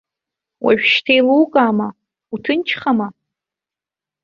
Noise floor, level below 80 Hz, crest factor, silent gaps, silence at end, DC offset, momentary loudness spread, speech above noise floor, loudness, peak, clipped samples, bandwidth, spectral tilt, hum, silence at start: -88 dBFS; -62 dBFS; 16 dB; none; 1.15 s; under 0.1%; 14 LU; 73 dB; -15 LUFS; -2 dBFS; under 0.1%; 7 kHz; -6 dB/octave; none; 0.6 s